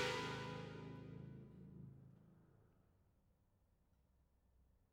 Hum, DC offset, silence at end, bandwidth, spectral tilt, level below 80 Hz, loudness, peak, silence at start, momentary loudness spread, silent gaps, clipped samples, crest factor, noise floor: none; under 0.1%; 0.3 s; 16 kHz; -4.5 dB/octave; -74 dBFS; -51 LUFS; -28 dBFS; 0 s; 19 LU; none; under 0.1%; 24 dB; -78 dBFS